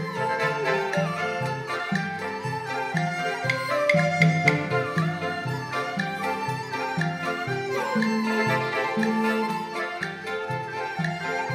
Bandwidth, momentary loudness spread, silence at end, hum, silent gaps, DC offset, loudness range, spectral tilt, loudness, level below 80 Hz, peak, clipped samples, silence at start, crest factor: 15.5 kHz; 8 LU; 0 s; none; none; under 0.1%; 3 LU; -5.5 dB/octave; -26 LUFS; -66 dBFS; -4 dBFS; under 0.1%; 0 s; 22 dB